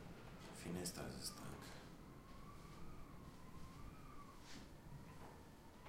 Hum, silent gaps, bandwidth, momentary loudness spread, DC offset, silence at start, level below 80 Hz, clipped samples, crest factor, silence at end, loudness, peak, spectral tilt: none; none; 16 kHz; 11 LU; under 0.1%; 0 s; -62 dBFS; under 0.1%; 20 dB; 0 s; -55 LUFS; -34 dBFS; -4 dB/octave